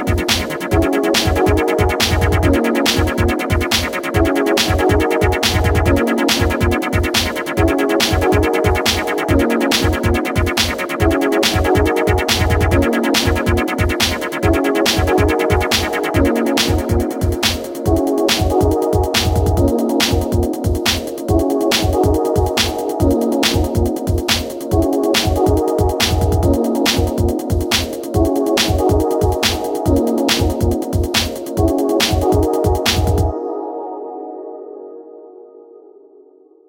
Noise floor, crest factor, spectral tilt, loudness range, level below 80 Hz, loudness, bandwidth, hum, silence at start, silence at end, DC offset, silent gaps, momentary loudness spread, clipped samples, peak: -47 dBFS; 16 dB; -4.5 dB/octave; 1 LU; -26 dBFS; -16 LUFS; 17 kHz; none; 0 s; 0.9 s; under 0.1%; none; 4 LU; under 0.1%; 0 dBFS